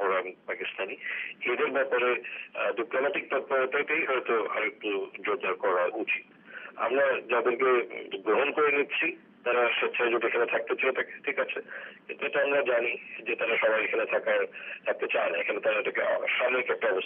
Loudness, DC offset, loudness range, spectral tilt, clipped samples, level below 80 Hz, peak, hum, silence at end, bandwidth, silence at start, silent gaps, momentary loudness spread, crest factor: -28 LUFS; under 0.1%; 3 LU; 0 dB/octave; under 0.1%; -90 dBFS; -14 dBFS; none; 0 s; 3.8 kHz; 0 s; none; 9 LU; 16 dB